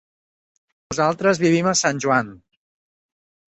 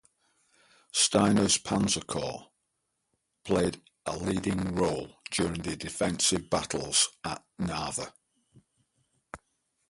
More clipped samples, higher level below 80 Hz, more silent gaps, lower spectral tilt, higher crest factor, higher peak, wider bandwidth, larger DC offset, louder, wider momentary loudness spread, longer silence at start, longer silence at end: neither; second, -60 dBFS vs -54 dBFS; neither; about the same, -4 dB/octave vs -3.5 dB/octave; about the same, 20 dB vs 22 dB; first, -2 dBFS vs -10 dBFS; second, 8.4 kHz vs 11.5 kHz; neither; first, -19 LUFS vs -28 LUFS; second, 8 LU vs 15 LU; about the same, 0.9 s vs 0.95 s; first, 1.15 s vs 0.55 s